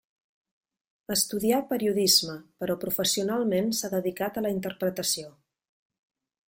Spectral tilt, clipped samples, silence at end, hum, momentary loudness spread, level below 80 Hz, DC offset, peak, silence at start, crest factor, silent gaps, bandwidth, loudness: -3 dB/octave; under 0.1%; 1.15 s; none; 10 LU; -66 dBFS; under 0.1%; -8 dBFS; 1.1 s; 22 dB; none; 16.5 kHz; -26 LUFS